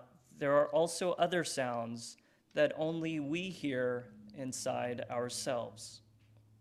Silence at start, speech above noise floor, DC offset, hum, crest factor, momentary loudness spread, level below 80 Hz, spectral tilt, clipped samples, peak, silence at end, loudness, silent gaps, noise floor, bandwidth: 0 s; 29 dB; under 0.1%; none; 20 dB; 14 LU; -76 dBFS; -4.5 dB/octave; under 0.1%; -16 dBFS; 0.65 s; -35 LUFS; none; -64 dBFS; 14 kHz